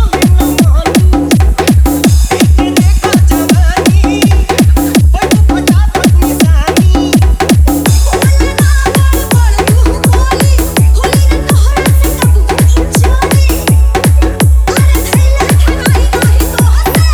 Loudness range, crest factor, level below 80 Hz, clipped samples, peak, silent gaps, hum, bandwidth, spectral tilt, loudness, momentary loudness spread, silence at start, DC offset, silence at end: 1 LU; 6 dB; -10 dBFS; 0.5%; 0 dBFS; none; none; over 20 kHz; -5.5 dB/octave; -8 LUFS; 1 LU; 0 s; under 0.1%; 0 s